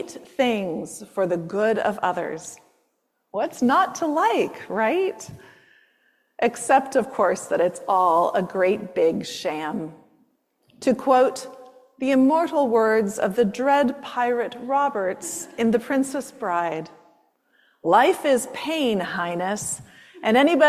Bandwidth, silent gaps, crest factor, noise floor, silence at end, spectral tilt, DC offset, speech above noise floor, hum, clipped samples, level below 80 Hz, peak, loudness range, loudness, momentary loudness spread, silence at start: 15 kHz; none; 18 dB; -72 dBFS; 0 s; -4.5 dB/octave; under 0.1%; 50 dB; none; under 0.1%; -66 dBFS; -4 dBFS; 4 LU; -22 LUFS; 12 LU; 0 s